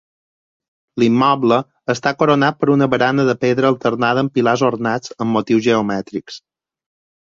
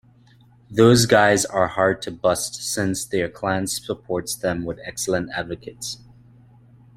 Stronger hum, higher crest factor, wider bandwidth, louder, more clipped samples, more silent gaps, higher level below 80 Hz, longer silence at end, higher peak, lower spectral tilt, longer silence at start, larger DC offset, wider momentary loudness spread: neither; second, 16 dB vs 22 dB; second, 7.6 kHz vs 16 kHz; first, -16 LUFS vs -21 LUFS; neither; neither; second, -58 dBFS vs -50 dBFS; second, 0.85 s vs 1 s; about the same, -2 dBFS vs 0 dBFS; first, -6 dB/octave vs -4 dB/octave; first, 0.95 s vs 0.7 s; neither; second, 9 LU vs 15 LU